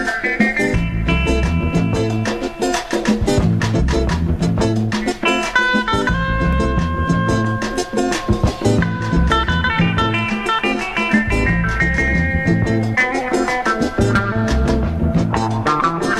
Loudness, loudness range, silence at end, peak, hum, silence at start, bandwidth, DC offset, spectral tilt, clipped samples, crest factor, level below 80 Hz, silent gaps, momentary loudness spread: -17 LUFS; 1 LU; 0 s; -2 dBFS; none; 0 s; 13 kHz; under 0.1%; -6 dB/octave; under 0.1%; 14 dB; -26 dBFS; none; 3 LU